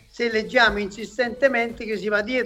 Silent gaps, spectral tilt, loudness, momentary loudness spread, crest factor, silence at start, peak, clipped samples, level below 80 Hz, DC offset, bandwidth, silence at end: none; -4 dB/octave; -22 LUFS; 10 LU; 20 dB; 0.15 s; -4 dBFS; under 0.1%; -48 dBFS; under 0.1%; 14 kHz; 0 s